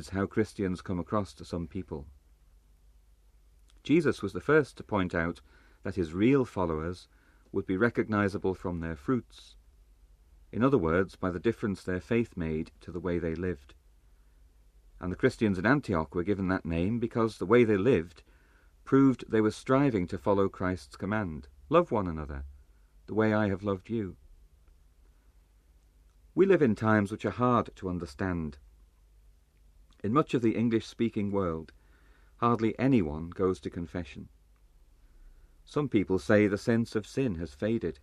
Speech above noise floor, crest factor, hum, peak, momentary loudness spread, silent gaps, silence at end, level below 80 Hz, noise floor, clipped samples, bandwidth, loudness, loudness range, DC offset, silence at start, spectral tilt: 33 dB; 22 dB; 50 Hz at -60 dBFS; -10 dBFS; 13 LU; none; 0.1 s; -52 dBFS; -61 dBFS; under 0.1%; 12 kHz; -29 LUFS; 6 LU; under 0.1%; 0 s; -7.5 dB/octave